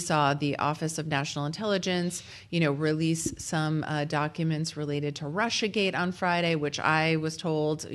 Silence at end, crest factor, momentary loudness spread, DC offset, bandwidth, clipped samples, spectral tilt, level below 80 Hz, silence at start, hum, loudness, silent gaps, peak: 0 s; 18 dB; 6 LU; under 0.1%; 12.5 kHz; under 0.1%; -5 dB/octave; -62 dBFS; 0 s; none; -28 LUFS; none; -10 dBFS